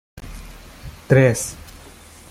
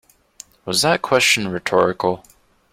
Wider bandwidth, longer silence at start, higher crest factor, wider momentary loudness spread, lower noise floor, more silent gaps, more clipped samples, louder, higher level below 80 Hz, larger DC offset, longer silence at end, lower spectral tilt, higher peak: about the same, 15.5 kHz vs 16.5 kHz; second, 0.15 s vs 0.65 s; about the same, 20 dB vs 18 dB; first, 25 LU vs 10 LU; about the same, -43 dBFS vs -46 dBFS; neither; neither; about the same, -18 LUFS vs -17 LUFS; first, -42 dBFS vs -56 dBFS; neither; first, 0.75 s vs 0.55 s; first, -6 dB/octave vs -3 dB/octave; about the same, -2 dBFS vs -2 dBFS